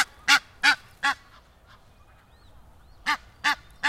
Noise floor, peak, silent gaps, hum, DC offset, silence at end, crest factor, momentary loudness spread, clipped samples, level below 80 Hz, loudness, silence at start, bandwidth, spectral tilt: -55 dBFS; -4 dBFS; none; none; under 0.1%; 0 s; 24 dB; 9 LU; under 0.1%; -56 dBFS; -24 LUFS; 0 s; 16 kHz; 0.5 dB/octave